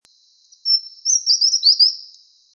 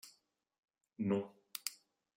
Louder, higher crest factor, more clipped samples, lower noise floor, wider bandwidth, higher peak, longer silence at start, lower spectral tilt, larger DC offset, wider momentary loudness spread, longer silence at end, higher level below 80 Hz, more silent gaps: first, -14 LUFS vs -41 LUFS; second, 16 dB vs 26 dB; neither; second, -56 dBFS vs -76 dBFS; second, 7.2 kHz vs 16 kHz; first, -2 dBFS vs -18 dBFS; first, 0.65 s vs 0.05 s; second, 9 dB/octave vs -5 dB/octave; neither; about the same, 10 LU vs 10 LU; about the same, 0.5 s vs 0.4 s; about the same, under -90 dBFS vs -88 dBFS; second, none vs 0.58-0.63 s